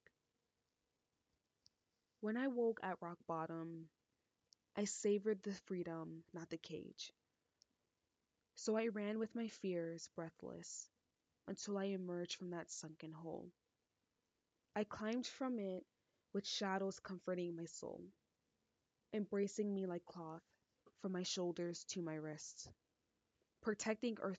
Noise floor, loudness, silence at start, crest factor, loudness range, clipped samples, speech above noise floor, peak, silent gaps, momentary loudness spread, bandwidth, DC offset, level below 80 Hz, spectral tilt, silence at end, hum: -90 dBFS; -45 LUFS; 2.2 s; 20 dB; 4 LU; under 0.1%; 45 dB; -26 dBFS; none; 13 LU; 9 kHz; under 0.1%; -86 dBFS; -4.5 dB/octave; 0 s; none